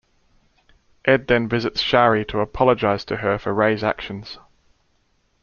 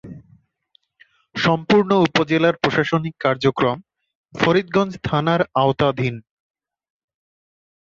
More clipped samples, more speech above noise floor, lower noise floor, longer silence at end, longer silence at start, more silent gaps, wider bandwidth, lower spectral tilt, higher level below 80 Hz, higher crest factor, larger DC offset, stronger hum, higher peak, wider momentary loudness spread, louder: neither; about the same, 45 dB vs 44 dB; about the same, -64 dBFS vs -63 dBFS; second, 1.05 s vs 1.7 s; first, 1.05 s vs 0.05 s; second, none vs 4.15-4.24 s; about the same, 7 kHz vs 7.4 kHz; about the same, -6.5 dB/octave vs -6.5 dB/octave; first, -46 dBFS vs -52 dBFS; about the same, 20 dB vs 18 dB; neither; neither; about the same, -2 dBFS vs -4 dBFS; first, 14 LU vs 9 LU; about the same, -20 LUFS vs -19 LUFS